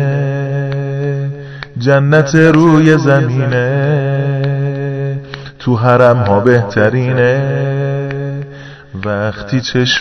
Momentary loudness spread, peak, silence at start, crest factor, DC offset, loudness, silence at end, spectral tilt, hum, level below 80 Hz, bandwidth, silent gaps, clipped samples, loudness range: 14 LU; 0 dBFS; 0 s; 12 dB; 0.3%; -13 LUFS; 0 s; -7 dB/octave; none; -46 dBFS; 6.4 kHz; none; 0.5%; 3 LU